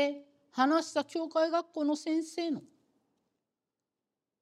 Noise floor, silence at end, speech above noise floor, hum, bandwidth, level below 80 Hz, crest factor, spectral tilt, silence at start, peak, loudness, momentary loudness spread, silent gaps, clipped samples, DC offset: -89 dBFS; 1.75 s; 58 dB; none; 12 kHz; under -90 dBFS; 20 dB; -3.5 dB/octave; 0 s; -14 dBFS; -32 LUFS; 10 LU; none; under 0.1%; under 0.1%